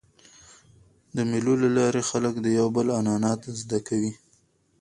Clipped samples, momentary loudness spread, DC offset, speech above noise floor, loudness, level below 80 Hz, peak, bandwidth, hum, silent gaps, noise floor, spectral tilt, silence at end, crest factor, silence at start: under 0.1%; 8 LU; under 0.1%; 41 dB; -25 LUFS; -62 dBFS; -10 dBFS; 11.5 kHz; none; none; -65 dBFS; -5.5 dB/octave; 0.65 s; 16 dB; 1.15 s